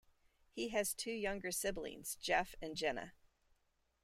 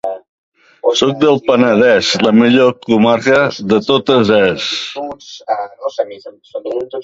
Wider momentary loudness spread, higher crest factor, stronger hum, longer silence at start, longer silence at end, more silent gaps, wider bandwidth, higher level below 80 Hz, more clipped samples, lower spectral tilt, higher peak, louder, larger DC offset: second, 9 LU vs 15 LU; first, 22 dB vs 14 dB; neither; first, 0.55 s vs 0.05 s; first, 0.95 s vs 0 s; second, none vs 0.29-0.52 s; first, 16 kHz vs 7.8 kHz; second, -62 dBFS vs -52 dBFS; neither; second, -2.5 dB/octave vs -5 dB/octave; second, -20 dBFS vs 0 dBFS; second, -40 LUFS vs -13 LUFS; neither